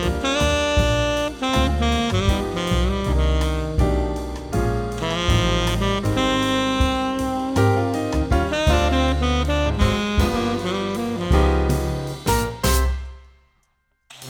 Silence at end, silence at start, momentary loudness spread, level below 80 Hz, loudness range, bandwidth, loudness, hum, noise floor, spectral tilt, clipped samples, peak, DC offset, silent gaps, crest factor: 0 s; 0 s; 5 LU; -26 dBFS; 2 LU; 20 kHz; -21 LUFS; none; -67 dBFS; -5.5 dB/octave; under 0.1%; -4 dBFS; under 0.1%; none; 16 dB